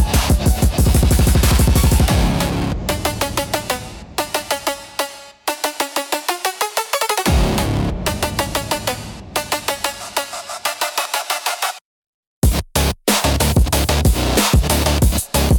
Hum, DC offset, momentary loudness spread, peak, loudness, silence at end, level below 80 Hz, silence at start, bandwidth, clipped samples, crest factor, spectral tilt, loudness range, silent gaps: none; under 0.1%; 10 LU; 0 dBFS; -18 LUFS; 0 s; -22 dBFS; 0 s; 19 kHz; under 0.1%; 16 dB; -4 dB/octave; 6 LU; 11.81-12.42 s